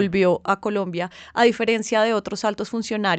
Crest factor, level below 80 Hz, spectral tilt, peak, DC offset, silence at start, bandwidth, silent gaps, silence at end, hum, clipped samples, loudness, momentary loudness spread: 16 dB; -58 dBFS; -5 dB/octave; -4 dBFS; under 0.1%; 0 s; 9 kHz; none; 0 s; none; under 0.1%; -22 LUFS; 9 LU